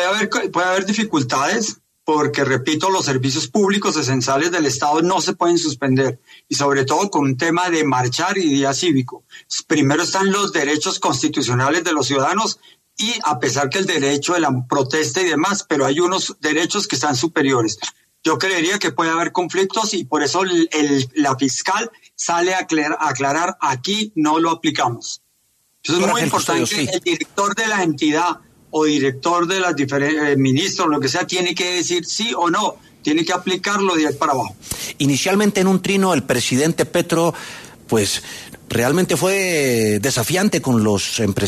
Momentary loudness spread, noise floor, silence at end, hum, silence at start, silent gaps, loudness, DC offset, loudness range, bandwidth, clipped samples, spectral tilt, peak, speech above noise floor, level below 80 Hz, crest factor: 5 LU; -62 dBFS; 0 s; none; 0 s; none; -18 LUFS; under 0.1%; 1 LU; 13.5 kHz; under 0.1%; -4 dB/octave; -4 dBFS; 44 dB; -56 dBFS; 14 dB